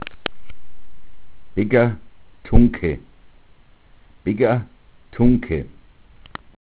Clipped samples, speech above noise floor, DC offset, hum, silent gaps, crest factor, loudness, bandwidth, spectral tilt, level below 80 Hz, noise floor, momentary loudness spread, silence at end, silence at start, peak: under 0.1%; 33 dB; under 0.1%; none; none; 20 dB; -20 LUFS; 4 kHz; -11.5 dB/octave; -30 dBFS; -49 dBFS; 22 LU; 0.2 s; 0 s; 0 dBFS